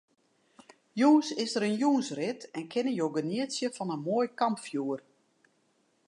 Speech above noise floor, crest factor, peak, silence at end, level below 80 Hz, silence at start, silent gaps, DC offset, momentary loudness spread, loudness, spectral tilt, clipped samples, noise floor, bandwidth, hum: 42 dB; 18 dB; -12 dBFS; 1.1 s; -84 dBFS; 0.95 s; none; under 0.1%; 11 LU; -30 LUFS; -5 dB/octave; under 0.1%; -71 dBFS; 11 kHz; none